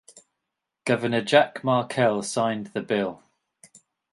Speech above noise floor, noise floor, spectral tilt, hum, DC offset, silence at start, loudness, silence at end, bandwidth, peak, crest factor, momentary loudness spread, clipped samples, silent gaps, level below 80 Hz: 60 dB; -83 dBFS; -5 dB/octave; none; under 0.1%; 0.15 s; -24 LUFS; 0.95 s; 11.5 kHz; -2 dBFS; 24 dB; 9 LU; under 0.1%; none; -68 dBFS